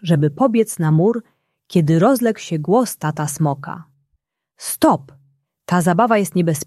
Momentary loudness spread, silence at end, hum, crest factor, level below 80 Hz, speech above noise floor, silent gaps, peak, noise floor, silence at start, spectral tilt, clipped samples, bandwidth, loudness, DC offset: 11 LU; 0.05 s; none; 16 dB; -58 dBFS; 54 dB; none; -2 dBFS; -70 dBFS; 0.05 s; -6.5 dB/octave; under 0.1%; 14.5 kHz; -17 LUFS; under 0.1%